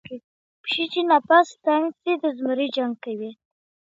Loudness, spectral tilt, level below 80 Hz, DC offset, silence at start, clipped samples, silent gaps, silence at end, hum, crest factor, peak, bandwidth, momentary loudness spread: -22 LUFS; -4 dB/octave; -76 dBFS; under 0.1%; 0.1 s; under 0.1%; 0.24-0.64 s; 0.65 s; none; 20 dB; -4 dBFS; 7.8 kHz; 17 LU